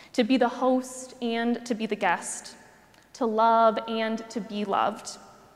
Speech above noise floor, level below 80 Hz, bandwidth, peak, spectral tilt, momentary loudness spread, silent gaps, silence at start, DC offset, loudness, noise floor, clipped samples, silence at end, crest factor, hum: 30 dB; -72 dBFS; 14 kHz; -10 dBFS; -4 dB/octave; 16 LU; none; 0 s; under 0.1%; -26 LUFS; -56 dBFS; under 0.1%; 0.3 s; 18 dB; none